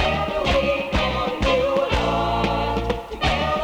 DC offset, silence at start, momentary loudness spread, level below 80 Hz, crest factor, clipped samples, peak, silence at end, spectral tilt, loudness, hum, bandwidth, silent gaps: under 0.1%; 0 s; 4 LU; -30 dBFS; 14 dB; under 0.1%; -6 dBFS; 0 s; -5.5 dB/octave; -21 LUFS; none; 18 kHz; none